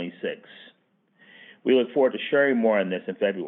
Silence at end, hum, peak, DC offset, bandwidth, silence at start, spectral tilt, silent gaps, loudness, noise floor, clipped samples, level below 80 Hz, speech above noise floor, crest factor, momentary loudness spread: 0 s; none; -8 dBFS; under 0.1%; 4 kHz; 0 s; -9 dB/octave; none; -24 LUFS; -66 dBFS; under 0.1%; under -90 dBFS; 43 dB; 16 dB; 13 LU